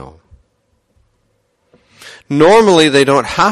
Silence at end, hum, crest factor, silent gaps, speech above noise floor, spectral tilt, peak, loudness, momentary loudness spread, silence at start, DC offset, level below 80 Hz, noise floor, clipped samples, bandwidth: 0 s; none; 14 dB; none; 53 dB; -4.5 dB/octave; 0 dBFS; -9 LUFS; 5 LU; 0 s; under 0.1%; -46 dBFS; -61 dBFS; under 0.1%; 12.5 kHz